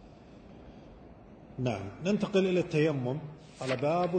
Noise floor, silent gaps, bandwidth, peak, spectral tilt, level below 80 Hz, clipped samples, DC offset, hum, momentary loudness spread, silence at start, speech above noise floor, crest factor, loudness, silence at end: -52 dBFS; none; 9.2 kHz; -14 dBFS; -7 dB/octave; -60 dBFS; under 0.1%; under 0.1%; none; 24 LU; 0 s; 23 dB; 18 dB; -31 LUFS; 0 s